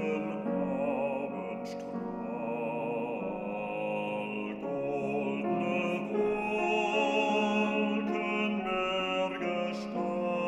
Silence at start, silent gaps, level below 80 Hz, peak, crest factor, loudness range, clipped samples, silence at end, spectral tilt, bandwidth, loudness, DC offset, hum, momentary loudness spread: 0 s; none; -66 dBFS; -16 dBFS; 14 dB; 6 LU; under 0.1%; 0 s; -6 dB/octave; 11 kHz; -32 LUFS; under 0.1%; none; 8 LU